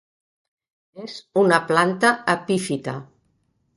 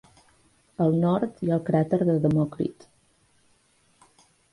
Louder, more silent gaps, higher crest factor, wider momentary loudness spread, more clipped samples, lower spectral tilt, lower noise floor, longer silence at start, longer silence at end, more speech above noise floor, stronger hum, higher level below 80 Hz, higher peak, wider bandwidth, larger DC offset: first, -20 LUFS vs -24 LUFS; neither; first, 22 dB vs 16 dB; first, 19 LU vs 9 LU; neither; second, -5 dB/octave vs -9.5 dB/octave; first, -68 dBFS vs -64 dBFS; first, 0.95 s vs 0.8 s; second, 0.75 s vs 1.8 s; first, 47 dB vs 41 dB; neither; second, -66 dBFS vs -60 dBFS; first, 0 dBFS vs -10 dBFS; about the same, 11.5 kHz vs 11 kHz; neither